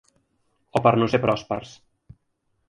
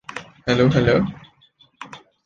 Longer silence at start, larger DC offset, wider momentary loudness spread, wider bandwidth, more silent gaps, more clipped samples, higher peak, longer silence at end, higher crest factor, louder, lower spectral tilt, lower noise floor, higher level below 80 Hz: first, 0.75 s vs 0.15 s; neither; second, 12 LU vs 23 LU; first, 11.5 kHz vs 9 kHz; neither; neither; about the same, -2 dBFS vs -4 dBFS; first, 1 s vs 0.3 s; first, 24 dB vs 18 dB; second, -22 LUFS vs -19 LUFS; about the same, -7 dB/octave vs -7 dB/octave; first, -72 dBFS vs -57 dBFS; second, -56 dBFS vs -44 dBFS